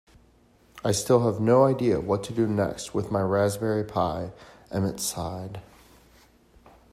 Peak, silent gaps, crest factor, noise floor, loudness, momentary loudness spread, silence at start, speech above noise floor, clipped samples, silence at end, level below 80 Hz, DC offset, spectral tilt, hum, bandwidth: -8 dBFS; none; 18 dB; -59 dBFS; -25 LUFS; 13 LU; 0.75 s; 34 dB; under 0.1%; 1.3 s; -56 dBFS; under 0.1%; -6 dB/octave; none; 16 kHz